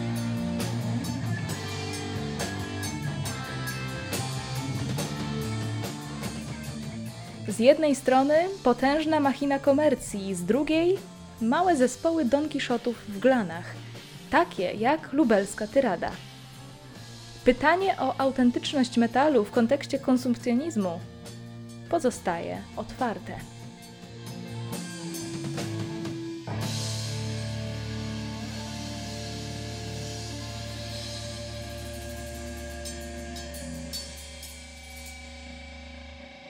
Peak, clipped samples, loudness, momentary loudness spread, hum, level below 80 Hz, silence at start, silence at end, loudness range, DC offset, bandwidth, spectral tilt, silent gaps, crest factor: -6 dBFS; under 0.1%; -28 LUFS; 19 LU; none; -50 dBFS; 0 s; 0 s; 12 LU; under 0.1%; 18 kHz; -5.5 dB/octave; none; 24 dB